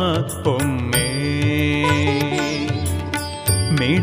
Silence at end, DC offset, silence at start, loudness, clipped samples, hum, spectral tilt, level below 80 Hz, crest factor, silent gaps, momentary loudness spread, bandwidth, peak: 0 s; under 0.1%; 0 s; -20 LUFS; under 0.1%; none; -5 dB/octave; -38 dBFS; 14 dB; none; 5 LU; 15.5 kHz; -4 dBFS